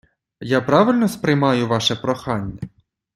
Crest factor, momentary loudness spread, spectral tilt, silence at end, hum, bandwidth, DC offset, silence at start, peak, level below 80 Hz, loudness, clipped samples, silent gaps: 18 dB; 18 LU; -5.5 dB/octave; 0.5 s; none; 14.5 kHz; under 0.1%; 0.4 s; -2 dBFS; -52 dBFS; -19 LUFS; under 0.1%; none